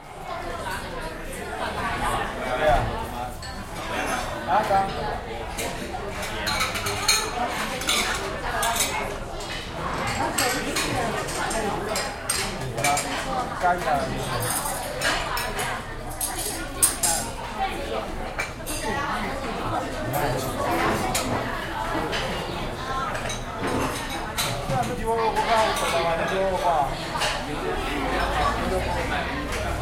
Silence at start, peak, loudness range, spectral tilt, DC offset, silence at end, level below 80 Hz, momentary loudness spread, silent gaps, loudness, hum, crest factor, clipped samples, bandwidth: 0 s; -4 dBFS; 3 LU; -3 dB/octave; under 0.1%; 0 s; -38 dBFS; 9 LU; none; -26 LUFS; none; 22 dB; under 0.1%; 16.5 kHz